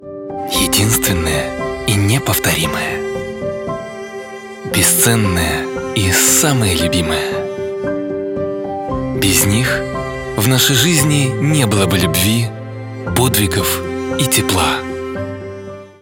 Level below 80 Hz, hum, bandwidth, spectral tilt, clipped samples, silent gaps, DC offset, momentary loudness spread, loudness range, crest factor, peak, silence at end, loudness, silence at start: -38 dBFS; none; 18.5 kHz; -3.5 dB/octave; under 0.1%; none; under 0.1%; 14 LU; 4 LU; 16 dB; 0 dBFS; 0.1 s; -15 LUFS; 0 s